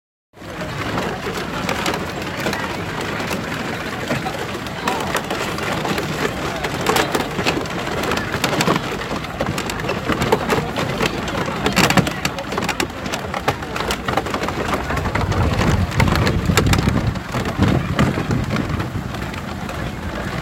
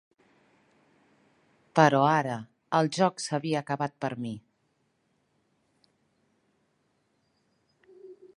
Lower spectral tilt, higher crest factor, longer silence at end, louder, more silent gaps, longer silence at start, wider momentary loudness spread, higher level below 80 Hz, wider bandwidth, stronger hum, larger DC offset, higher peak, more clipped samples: about the same, -5 dB/octave vs -5.5 dB/octave; second, 20 dB vs 26 dB; second, 0 s vs 0.25 s; first, -21 LUFS vs -27 LUFS; neither; second, 0.35 s vs 1.75 s; second, 8 LU vs 16 LU; first, -34 dBFS vs -76 dBFS; first, 17 kHz vs 11.5 kHz; neither; neither; first, 0 dBFS vs -4 dBFS; neither